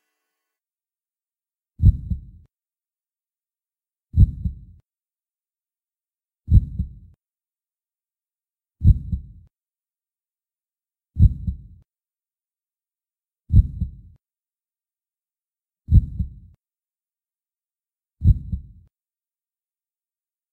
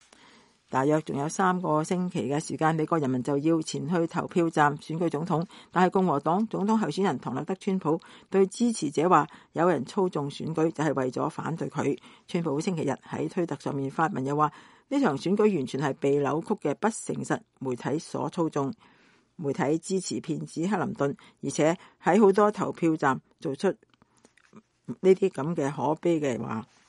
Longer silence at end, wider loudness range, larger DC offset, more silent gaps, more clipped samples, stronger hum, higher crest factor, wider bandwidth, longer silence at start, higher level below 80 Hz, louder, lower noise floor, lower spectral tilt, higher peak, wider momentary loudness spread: first, 1.9 s vs 0.25 s; about the same, 3 LU vs 4 LU; neither; neither; neither; neither; about the same, 22 dB vs 20 dB; second, 3.9 kHz vs 11.5 kHz; first, 1.8 s vs 0.7 s; first, -28 dBFS vs -70 dBFS; first, -22 LUFS vs -27 LUFS; first, under -90 dBFS vs -62 dBFS; first, -12 dB/octave vs -6 dB/octave; first, -2 dBFS vs -6 dBFS; first, 14 LU vs 9 LU